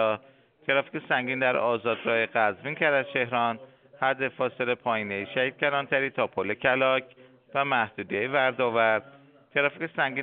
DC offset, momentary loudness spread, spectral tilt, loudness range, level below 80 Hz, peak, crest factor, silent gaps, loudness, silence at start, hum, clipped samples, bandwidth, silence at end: under 0.1%; 6 LU; -2 dB/octave; 2 LU; -72 dBFS; -8 dBFS; 20 dB; none; -26 LUFS; 0 s; none; under 0.1%; 4.5 kHz; 0 s